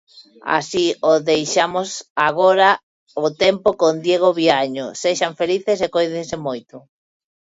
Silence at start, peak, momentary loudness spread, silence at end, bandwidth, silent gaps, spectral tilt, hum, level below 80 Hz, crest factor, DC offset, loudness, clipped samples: 0.15 s; 0 dBFS; 10 LU; 0.75 s; 8 kHz; 2.10-2.16 s, 2.83-3.06 s; -3.5 dB/octave; none; -60 dBFS; 18 dB; under 0.1%; -18 LUFS; under 0.1%